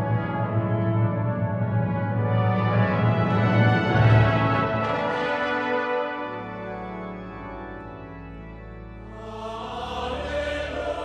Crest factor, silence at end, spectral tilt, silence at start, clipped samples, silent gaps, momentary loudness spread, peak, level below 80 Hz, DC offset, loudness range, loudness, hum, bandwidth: 18 dB; 0 s; -8 dB/octave; 0 s; under 0.1%; none; 19 LU; -6 dBFS; -44 dBFS; under 0.1%; 15 LU; -24 LUFS; none; 6.6 kHz